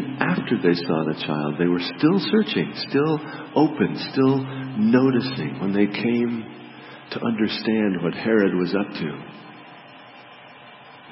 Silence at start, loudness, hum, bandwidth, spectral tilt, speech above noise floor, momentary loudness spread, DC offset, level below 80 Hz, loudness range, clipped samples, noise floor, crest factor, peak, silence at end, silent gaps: 0 s; -22 LUFS; none; 5.8 kHz; -10.5 dB/octave; 23 dB; 18 LU; under 0.1%; -66 dBFS; 3 LU; under 0.1%; -45 dBFS; 20 dB; -2 dBFS; 0 s; none